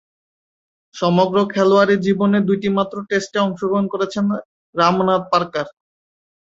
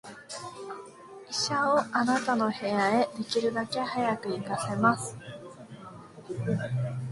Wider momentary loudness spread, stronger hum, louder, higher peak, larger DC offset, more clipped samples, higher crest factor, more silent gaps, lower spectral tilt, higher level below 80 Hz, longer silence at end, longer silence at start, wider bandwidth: second, 8 LU vs 20 LU; neither; first, -18 LUFS vs -28 LUFS; first, -2 dBFS vs -8 dBFS; neither; neither; second, 16 dB vs 22 dB; first, 4.45-4.73 s vs none; first, -6.5 dB/octave vs -5 dB/octave; first, -60 dBFS vs -66 dBFS; first, 0.8 s vs 0 s; first, 0.95 s vs 0.05 s; second, 7.8 kHz vs 11.5 kHz